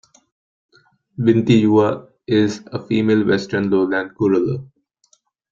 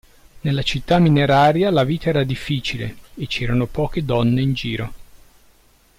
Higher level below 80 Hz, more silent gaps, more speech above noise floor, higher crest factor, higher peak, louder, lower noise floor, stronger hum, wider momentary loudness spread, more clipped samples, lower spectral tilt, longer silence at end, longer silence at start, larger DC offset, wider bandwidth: second, -56 dBFS vs -38 dBFS; neither; first, 44 dB vs 36 dB; about the same, 16 dB vs 14 dB; first, -2 dBFS vs -6 dBFS; about the same, -17 LUFS vs -19 LUFS; first, -61 dBFS vs -54 dBFS; neither; about the same, 12 LU vs 13 LU; neither; about the same, -7.5 dB/octave vs -7 dB/octave; about the same, 0.9 s vs 0.8 s; first, 1.2 s vs 0.35 s; neither; second, 7.6 kHz vs 15.5 kHz